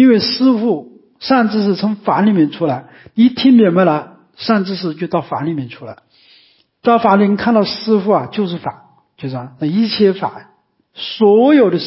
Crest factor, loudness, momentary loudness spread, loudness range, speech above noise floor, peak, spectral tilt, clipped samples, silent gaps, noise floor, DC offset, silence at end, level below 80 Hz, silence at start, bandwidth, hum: 14 dB; -14 LUFS; 15 LU; 4 LU; 38 dB; 0 dBFS; -10 dB/octave; under 0.1%; none; -52 dBFS; under 0.1%; 0 s; -58 dBFS; 0 s; 5.8 kHz; none